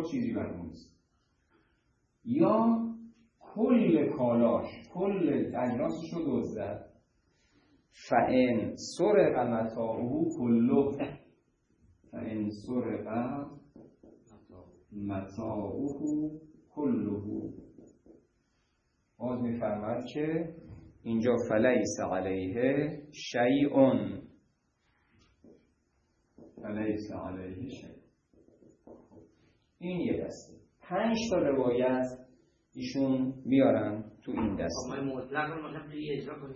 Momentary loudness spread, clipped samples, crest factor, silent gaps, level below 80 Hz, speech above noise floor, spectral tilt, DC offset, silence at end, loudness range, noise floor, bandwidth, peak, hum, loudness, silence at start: 17 LU; under 0.1%; 22 dB; none; -64 dBFS; 45 dB; -6.5 dB/octave; under 0.1%; 0 s; 12 LU; -75 dBFS; 9 kHz; -10 dBFS; none; -31 LUFS; 0 s